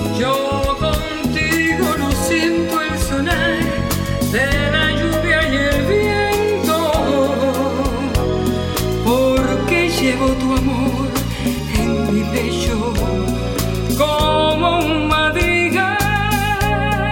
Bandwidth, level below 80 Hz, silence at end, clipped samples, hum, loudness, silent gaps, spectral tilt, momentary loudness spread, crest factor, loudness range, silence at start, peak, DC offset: 17 kHz; -28 dBFS; 0 s; under 0.1%; none; -17 LUFS; none; -5 dB/octave; 5 LU; 14 dB; 2 LU; 0 s; -2 dBFS; under 0.1%